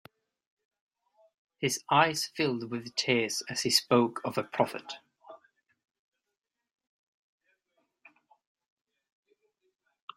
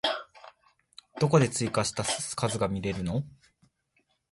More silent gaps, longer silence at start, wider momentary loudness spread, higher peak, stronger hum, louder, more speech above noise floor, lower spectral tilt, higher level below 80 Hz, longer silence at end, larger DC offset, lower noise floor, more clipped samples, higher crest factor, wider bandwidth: neither; first, 1.6 s vs 0.05 s; second, 10 LU vs 16 LU; about the same, -8 dBFS vs -8 dBFS; neither; about the same, -28 LUFS vs -28 LUFS; first, 49 dB vs 45 dB; about the same, -3.5 dB/octave vs -4.5 dB/octave; second, -76 dBFS vs -54 dBFS; first, 4.8 s vs 1 s; neither; first, -78 dBFS vs -73 dBFS; neither; about the same, 26 dB vs 22 dB; first, 16 kHz vs 11.5 kHz